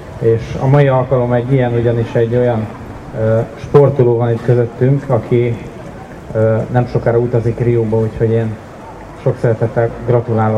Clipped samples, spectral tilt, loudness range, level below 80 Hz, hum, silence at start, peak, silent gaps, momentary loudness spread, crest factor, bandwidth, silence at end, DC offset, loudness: under 0.1%; -9.5 dB/octave; 2 LU; -38 dBFS; none; 0 s; 0 dBFS; none; 15 LU; 14 dB; 7.4 kHz; 0 s; under 0.1%; -14 LUFS